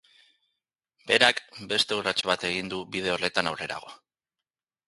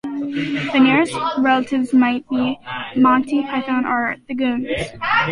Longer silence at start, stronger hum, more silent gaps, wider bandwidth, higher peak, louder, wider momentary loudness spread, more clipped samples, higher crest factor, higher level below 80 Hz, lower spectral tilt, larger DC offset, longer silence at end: first, 1.05 s vs 0.05 s; neither; neither; about the same, 11.5 kHz vs 11 kHz; about the same, -2 dBFS vs -4 dBFS; second, -26 LUFS vs -18 LUFS; first, 14 LU vs 9 LU; neither; first, 28 dB vs 14 dB; second, -64 dBFS vs -50 dBFS; second, -2.5 dB/octave vs -5.5 dB/octave; neither; first, 0.9 s vs 0 s